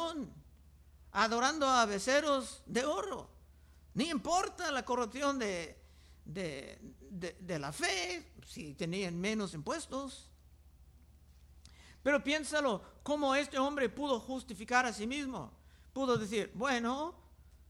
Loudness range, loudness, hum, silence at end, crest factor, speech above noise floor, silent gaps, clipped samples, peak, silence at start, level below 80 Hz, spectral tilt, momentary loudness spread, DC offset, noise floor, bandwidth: 7 LU; -35 LUFS; none; 0.05 s; 20 dB; 25 dB; none; under 0.1%; -16 dBFS; 0 s; -60 dBFS; -3.5 dB/octave; 16 LU; under 0.1%; -60 dBFS; 16 kHz